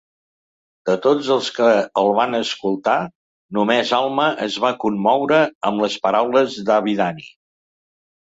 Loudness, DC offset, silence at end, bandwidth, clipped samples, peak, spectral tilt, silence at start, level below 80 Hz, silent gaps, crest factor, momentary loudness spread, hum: -18 LUFS; under 0.1%; 1 s; 8 kHz; under 0.1%; -2 dBFS; -5 dB/octave; 0.85 s; -64 dBFS; 3.15-3.49 s, 5.55-5.61 s; 16 dB; 6 LU; none